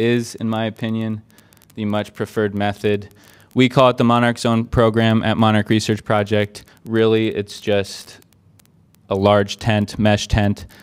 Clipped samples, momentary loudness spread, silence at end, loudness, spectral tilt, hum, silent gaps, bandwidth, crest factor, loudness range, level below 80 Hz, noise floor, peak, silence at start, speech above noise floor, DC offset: under 0.1%; 10 LU; 0.15 s; -18 LUFS; -6 dB/octave; none; none; 15.5 kHz; 18 dB; 5 LU; -40 dBFS; -53 dBFS; 0 dBFS; 0 s; 35 dB; under 0.1%